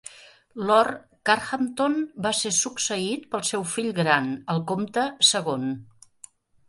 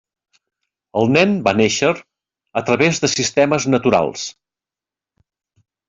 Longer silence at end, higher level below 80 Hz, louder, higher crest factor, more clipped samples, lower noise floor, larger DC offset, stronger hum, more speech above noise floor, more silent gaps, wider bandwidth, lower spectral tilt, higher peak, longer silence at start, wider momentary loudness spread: second, 0.85 s vs 1.55 s; second, -68 dBFS vs -56 dBFS; second, -24 LUFS vs -17 LUFS; about the same, 20 dB vs 18 dB; neither; second, -52 dBFS vs -89 dBFS; neither; neither; second, 27 dB vs 73 dB; neither; first, 11.5 kHz vs 7.8 kHz; about the same, -3 dB/octave vs -4 dB/octave; about the same, -4 dBFS vs -2 dBFS; second, 0.15 s vs 0.95 s; about the same, 10 LU vs 11 LU